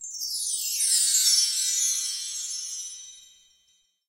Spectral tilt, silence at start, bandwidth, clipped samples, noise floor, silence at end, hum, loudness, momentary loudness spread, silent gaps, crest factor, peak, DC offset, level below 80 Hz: 7.5 dB/octave; 0 s; 16.5 kHz; under 0.1%; -67 dBFS; 0.85 s; none; -23 LUFS; 16 LU; none; 20 dB; -8 dBFS; under 0.1%; -74 dBFS